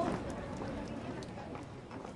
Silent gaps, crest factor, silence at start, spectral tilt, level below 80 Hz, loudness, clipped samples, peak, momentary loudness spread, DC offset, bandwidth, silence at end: none; 20 dB; 0 s; -6.5 dB/octave; -56 dBFS; -42 LUFS; under 0.1%; -22 dBFS; 7 LU; under 0.1%; 11.5 kHz; 0 s